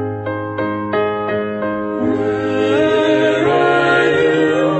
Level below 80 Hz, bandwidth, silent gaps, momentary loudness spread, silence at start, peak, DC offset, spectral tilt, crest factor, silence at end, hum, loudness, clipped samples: -52 dBFS; 8.4 kHz; none; 8 LU; 0 s; -2 dBFS; under 0.1%; -6.5 dB/octave; 14 dB; 0 s; none; -16 LUFS; under 0.1%